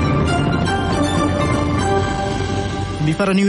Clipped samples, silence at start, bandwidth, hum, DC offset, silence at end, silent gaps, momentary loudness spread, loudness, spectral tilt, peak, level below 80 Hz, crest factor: under 0.1%; 0 s; 11.5 kHz; none; under 0.1%; 0 s; none; 4 LU; -18 LUFS; -6 dB/octave; -4 dBFS; -30 dBFS; 12 dB